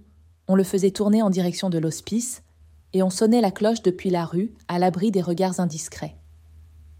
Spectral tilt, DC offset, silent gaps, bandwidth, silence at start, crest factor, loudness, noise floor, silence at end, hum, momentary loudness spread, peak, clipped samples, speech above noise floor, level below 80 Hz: -6 dB/octave; under 0.1%; none; 16 kHz; 0.5 s; 16 dB; -23 LUFS; -49 dBFS; 0.4 s; none; 12 LU; -8 dBFS; under 0.1%; 27 dB; -56 dBFS